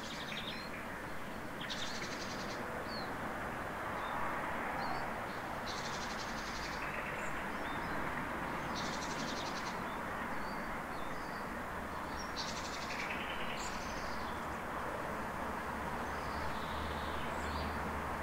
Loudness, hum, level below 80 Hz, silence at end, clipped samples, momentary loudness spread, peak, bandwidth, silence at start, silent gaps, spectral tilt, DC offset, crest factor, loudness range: -40 LUFS; none; -54 dBFS; 0 s; under 0.1%; 3 LU; -24 dBFS; 16 kHz; 0 s; none; -4 dB/octave; under 0.1%; 16 dB; 2 LU